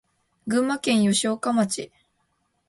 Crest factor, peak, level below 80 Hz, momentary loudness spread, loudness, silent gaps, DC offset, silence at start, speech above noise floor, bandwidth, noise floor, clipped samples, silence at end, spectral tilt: 16 dB; -10 dBFS; -66 dBFS; 14 LU; -23 LUFS; none; under 0.1%; 0.45 s; 49 dB; 11.5 kHz; -71 dBFS; under 0.1%; 0.85 s; -4 dB/octave